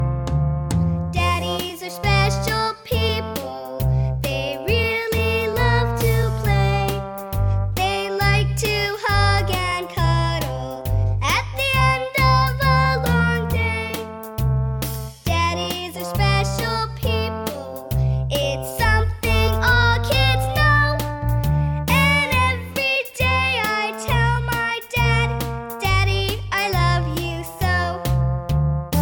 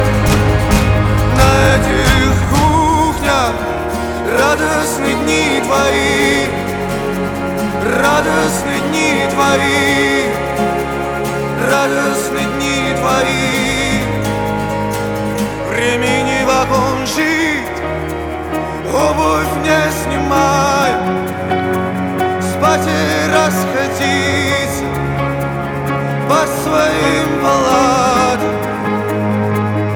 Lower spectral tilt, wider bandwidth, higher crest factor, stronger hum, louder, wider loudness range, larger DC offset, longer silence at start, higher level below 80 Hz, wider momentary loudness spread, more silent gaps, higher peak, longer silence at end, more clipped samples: about the same, -5 dB/octave vs -4.5 dB/octave; about the same, 19 kHz vs over 20 kHz; about the same, 16 dB vs 14 dB; neither; second, -20 LUFS vs -14 LUFS; about the same, 4 LU vs 3 LU; neither; about the same, 0 s vs 0 s; about the same, -28 dBFS vs -28 dBFS; about the same, 8 LU vs 7 LU; neither; second, -4 dBFS vs 0 dBFS; about the same, 0 s vs 0 s; neither